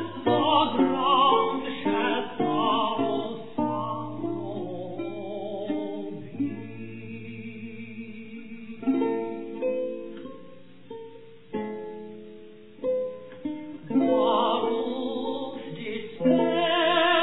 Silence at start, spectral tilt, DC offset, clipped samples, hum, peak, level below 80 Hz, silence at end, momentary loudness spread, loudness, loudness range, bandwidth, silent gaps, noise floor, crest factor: 0 s; -9 dB/octave; 0.5%; under 0.1%; none; -10 dBFS; -66 dBFS; 0 s; 19 LU; -27 LUFS; 11 LU; 4.1 kHz; none; -49 dBFS; 18 dB